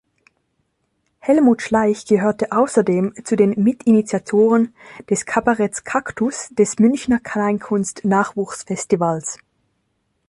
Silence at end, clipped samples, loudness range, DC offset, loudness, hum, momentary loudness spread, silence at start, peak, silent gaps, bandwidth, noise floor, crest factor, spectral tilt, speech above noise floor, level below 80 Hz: 0.95 s; under 0.1%; 3 LU; under 0.1%; -18 LUFS; none; 8 LU; 1.25 s; -2 dBFS; none; 11.5 kHz; -69 dBFS; 16 dB; -6 dB/octave; 52 dB; -56 dBFS